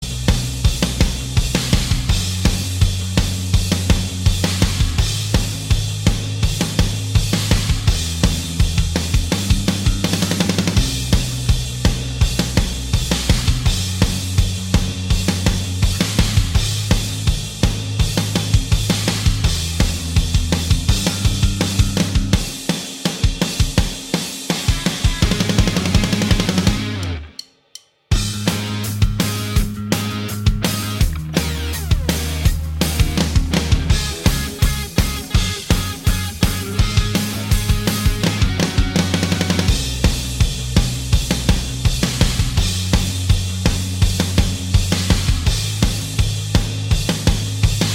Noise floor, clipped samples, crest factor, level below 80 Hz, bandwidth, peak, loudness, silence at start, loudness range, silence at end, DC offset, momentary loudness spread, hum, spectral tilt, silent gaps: -44 dBFS; under 0.1%; 18 dB; -22 dBFS; 17 kHz; 0 dBFS; -19 LUFS; 0 s; 2 LU; 0 s; under 0.1%; 3 LU; none; -4.5 dB/octave; none